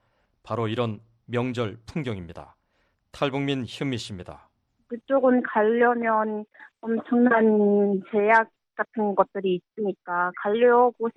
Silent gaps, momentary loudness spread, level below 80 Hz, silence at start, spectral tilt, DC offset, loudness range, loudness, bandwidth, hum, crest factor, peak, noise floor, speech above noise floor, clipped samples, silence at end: none; 16 LU; -62 dBFS; 0.45 s; -7 dB/octave; under 0.1%; 9 LU; -24 LUFS; 10.5 kHz; none; 18 dB; -6 dBFS; -70 dBFS; 47 dB; under 0.1%; 0.05 s